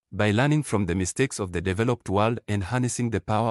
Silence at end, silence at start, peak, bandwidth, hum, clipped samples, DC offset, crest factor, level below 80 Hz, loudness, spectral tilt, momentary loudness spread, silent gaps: 0 s; 0.1 s; -10 dBFS; 12 kHz; none; under 0.1%; under 0.1%; 16 dB; -50 dBFS; -25 LUFS; -5.5 dB/octave; 5 LU; none